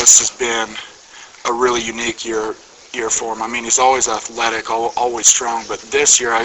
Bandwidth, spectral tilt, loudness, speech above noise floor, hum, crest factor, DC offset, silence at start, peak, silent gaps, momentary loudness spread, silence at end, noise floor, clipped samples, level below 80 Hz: 16 kHz; 0 dB/octave; -15 LUFS; 24 dB; none; 18 dB; under 0.1%; 0 s; 0 dBFS; none; 14 LU; 0 s; -40 dBFS; under 0.1%; -52 dBFS